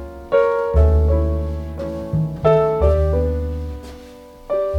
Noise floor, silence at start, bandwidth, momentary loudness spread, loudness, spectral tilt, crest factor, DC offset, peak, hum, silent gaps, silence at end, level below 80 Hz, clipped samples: -40 dBFS; 0 s; 5.4 kHz; 13 LU; -19 LUFS; -9 dB/octave; 16 dB; under 0.1%; -2 dBFS; none; none; 0 s; -22 dBFS; under 0.1%